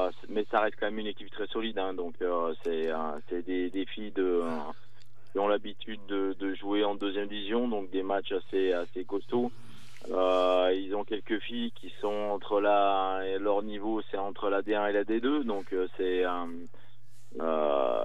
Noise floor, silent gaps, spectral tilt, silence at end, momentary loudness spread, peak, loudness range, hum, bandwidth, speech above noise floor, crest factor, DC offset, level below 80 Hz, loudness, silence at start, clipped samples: -61 dBFS; none; -6 dB/octave; 0 s; 9 LU; -12 dBFS; 4 LU; none; 11 kHz; 30 dB; 20 dB; 2%; -82 dBFS; -31 LUFS; 0 s; under 0.1%